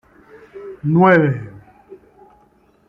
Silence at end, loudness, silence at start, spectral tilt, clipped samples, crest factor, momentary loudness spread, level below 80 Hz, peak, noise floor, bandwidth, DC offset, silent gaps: 0.95 s; -15 LUFS; 0.55 s; -9.5 dB/octave; under 0.1%; 18 dB; 25 LU; -56 dBFS; -2 dBFS; -55 dBFS; 5.4 kHz; under 0.1%; none